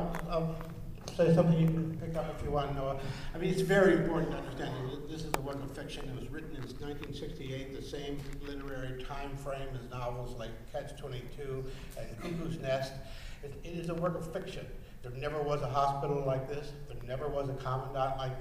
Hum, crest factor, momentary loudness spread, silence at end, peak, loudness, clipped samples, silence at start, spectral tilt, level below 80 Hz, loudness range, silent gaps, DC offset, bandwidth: none; 22 dB; 15 LU; 0 s; -12 dBFS; -35 LUFS; under 0.1%; 0 s; -7 dB/octave; -46 dBFS; 10 LU; none; under 0.1%; 15.5 kHz